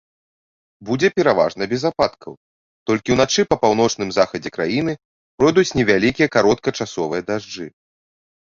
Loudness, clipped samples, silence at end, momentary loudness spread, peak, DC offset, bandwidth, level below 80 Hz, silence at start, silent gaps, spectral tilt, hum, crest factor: -18 LUFS; under 0.1%; 0.8 s; 15 LU; -2 dBFS; under 0.1%; 7.6 kHz; -50 dBFS; 0.8 s; 2.37-2.86 s, 5.05-5.38 s; -4.5 dB/octave; none; 18 dB